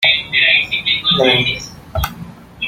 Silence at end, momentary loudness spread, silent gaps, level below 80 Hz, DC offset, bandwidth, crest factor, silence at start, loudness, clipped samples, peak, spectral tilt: 0 s; 14 LU; none; -36 dBFS; under 0.1%; 16.5 kHz; 16 dB; 0 s; -13 LUFS; under 0.1%; 0 dBFS; -3.5 dB/octave